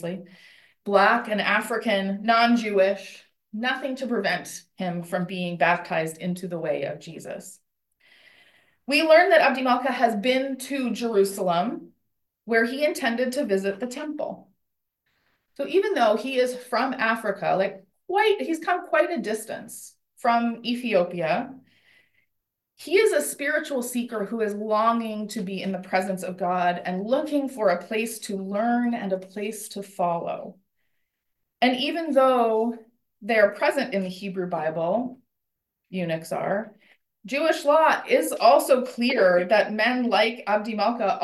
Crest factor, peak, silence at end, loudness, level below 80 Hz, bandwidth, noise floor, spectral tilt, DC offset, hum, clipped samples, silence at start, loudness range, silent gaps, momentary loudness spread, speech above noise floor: 20 dB; -6 dBFS; 0 s; -24 LUFS; -76 dBFS; 13 kHz; -81 dBFS; -4.5 dB/octave; under 0.1%; none; under 0.1%; 0 s; 7 LU; none; 13 LU; 57 dB